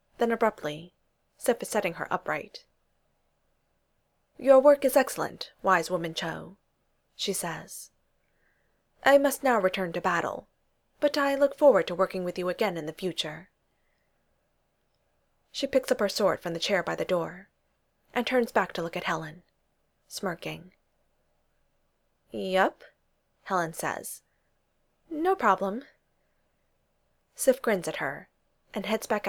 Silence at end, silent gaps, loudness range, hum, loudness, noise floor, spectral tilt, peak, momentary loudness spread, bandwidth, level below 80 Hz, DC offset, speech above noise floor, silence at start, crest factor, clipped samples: 0 s; none; 9 LU; none; -27 LUFS; -73 dBFS; -4 dB/octave; -6 dBFS; 17 LU; 19.5 kHz; -66 dBFS; under 0.1%; 46 dB; 0.2 s; 22 dB; under 0.1%